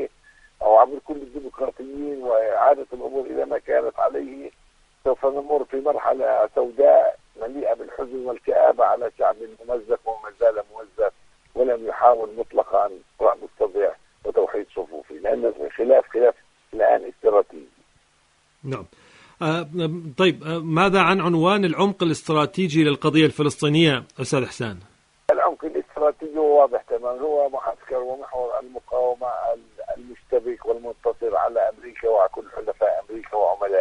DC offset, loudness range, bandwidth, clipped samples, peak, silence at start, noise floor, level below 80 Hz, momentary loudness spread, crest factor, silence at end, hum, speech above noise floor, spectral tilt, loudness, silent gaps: under 0.1%; 6 LU; 10.5 kHz; under 0.1%; 0 dBFS; 0 s; -62 dBFS; -56 dBFS; 14 LU; 20 dB; 0 s; none; 40 dB; -6 dB/octave; -22 LUFS; none